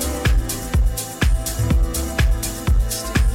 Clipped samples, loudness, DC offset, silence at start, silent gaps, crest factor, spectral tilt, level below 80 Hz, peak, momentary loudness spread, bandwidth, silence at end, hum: under 0.1%; -21 LUFS; under 0.1%; 0 s; none; 12 dB; -4.5 dB/octave; -20 dBFS; -6 dBFS; 2 LU; 17 kHz; 0 s; none